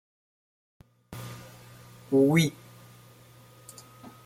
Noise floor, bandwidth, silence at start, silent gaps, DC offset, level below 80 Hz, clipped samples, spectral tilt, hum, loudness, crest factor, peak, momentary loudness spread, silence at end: -54 dBFS; 16.5 kHz; 1.1 s; none; under 0.1%; -66 dBFS; under 0.1%; -6 dB/octave; none; -24 LUFS; 22 dB; -10 dBFS; 28 LU; 0.2 s